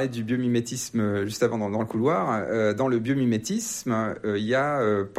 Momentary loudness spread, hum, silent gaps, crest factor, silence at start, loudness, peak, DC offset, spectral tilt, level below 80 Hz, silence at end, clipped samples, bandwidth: 4 LU; none; none; 16 dB; 0 s; -25 LUFS; -10 dBFS; under 0.1%; -5.5 dB/octave; -62 dBFS; 0 s; under 0.1%; 15 kHz